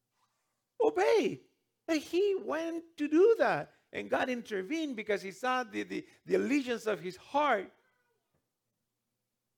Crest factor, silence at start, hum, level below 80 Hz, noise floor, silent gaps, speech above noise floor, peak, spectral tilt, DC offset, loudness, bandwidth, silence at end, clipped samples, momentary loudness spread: 18 dB; 0.8 s; none; -80 dBFS; -86 dBFS; none; 54 dB; -14 dBFS; -4.5 dB/octave; under 0.1%; -32 LUFS; 17 kHz; 1.9 s; under 0.1%; 13 LU